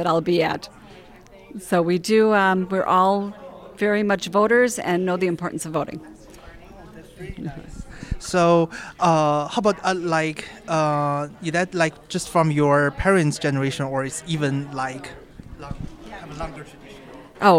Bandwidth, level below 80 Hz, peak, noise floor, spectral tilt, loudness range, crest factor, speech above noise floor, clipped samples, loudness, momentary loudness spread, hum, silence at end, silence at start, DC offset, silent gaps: 16 kHz; -44 dBFS; -4 dBFS; -46 dBFS; -5.5 dB/octave; 8 LU; 18 dB; 25 dB; under 0.1%; -21 LUFS; 21 LU; none; 0 s; 0 s; under 0.1%; none